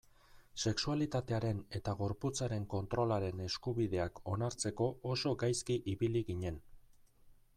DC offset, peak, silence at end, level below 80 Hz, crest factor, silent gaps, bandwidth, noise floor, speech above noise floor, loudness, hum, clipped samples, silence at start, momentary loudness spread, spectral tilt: under 0.1%; -22 dBFS; 0.25 s; -58 dBFS; 16 dB; none; 13.5 kHz; -63 dBFS; 27 dB; -37 LUFS; none; under 0.1%; 0.35 s; 5 LU; -5.5 dB/octave